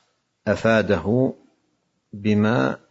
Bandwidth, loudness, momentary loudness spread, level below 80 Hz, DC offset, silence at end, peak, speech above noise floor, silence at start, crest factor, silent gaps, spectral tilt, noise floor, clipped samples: 8 kHz; -21 LUFS; 7 LU; -56 dBFS; under 0.1%; 0.15 s; -4 dBFS; 50 dB; 0.45 s; 18 dB; none; -7.5 dB/octave; -70 dBFS; under 0.1%